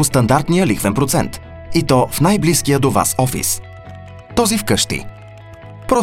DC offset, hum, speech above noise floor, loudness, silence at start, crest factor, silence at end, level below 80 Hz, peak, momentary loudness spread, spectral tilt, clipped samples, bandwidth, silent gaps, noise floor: under 0.1%; none; 21 dB; -16 LUFS; 0 s; 16 dB; 0 s; -36 dBFS; 0 dBFS; 21 LU; -4.5 dB/octave; under 0.1%; 17.5 kHz; none; -37 dBFS